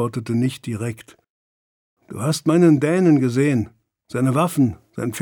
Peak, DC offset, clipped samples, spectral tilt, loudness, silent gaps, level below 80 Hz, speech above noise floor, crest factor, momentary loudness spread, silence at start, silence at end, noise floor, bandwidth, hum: -4 dBFS; under 0.1%; under 0.1%; -7 dB/octave; -19 LUFS; 1.30-1.97 s; -58 dBFS; over 71 dB; 16 dB; 14 LU; 0 s; 0 s; under -90 dBFS; 19.5 kHz; none